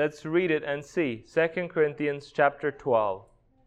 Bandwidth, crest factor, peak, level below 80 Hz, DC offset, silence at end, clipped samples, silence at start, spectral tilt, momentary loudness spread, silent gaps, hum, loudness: 9 kHz; 20 dB; -8 dBFS; -64 dBFS; under 0.1%; 0.45 s; under 0.1%; 0 s; -6.5 dB/octave; 6 LU; none; none; -27 LUFS